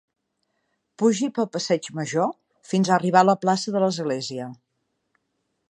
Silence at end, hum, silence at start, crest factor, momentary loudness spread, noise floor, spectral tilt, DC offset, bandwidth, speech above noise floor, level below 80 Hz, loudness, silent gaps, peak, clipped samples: 1.2 s; none; 1 s; 22 dB; 10 LU; -76 dBFS; -5 dB/octave; under 0.1%; 10.5 kHz; 54 dB; -74 dBFS; -23 LUFS; none; -2 dBFS; under 0.1%